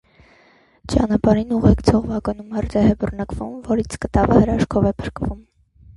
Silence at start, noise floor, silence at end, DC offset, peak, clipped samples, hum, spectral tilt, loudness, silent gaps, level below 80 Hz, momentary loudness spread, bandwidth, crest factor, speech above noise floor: 0.85 s; -54 dBFS; 0.55 s; under 0.1%; 0 dBFS; under 0.1%; none; -7.5 dB/octave; -19 LUFS; none; -32 dBFS; 12 LU; 11.5 kHz; 18 dB; 36 dB